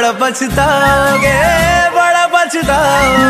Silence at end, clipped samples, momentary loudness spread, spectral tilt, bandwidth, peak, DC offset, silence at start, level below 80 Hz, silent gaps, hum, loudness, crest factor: 0 s; under 0.1%; 3 LU; -4 dB/octave; 15.5 kHz; 0 dBFS; under 0.1%; 0 s; -28 dBFS; none; none; -10 LUFS; 10 dB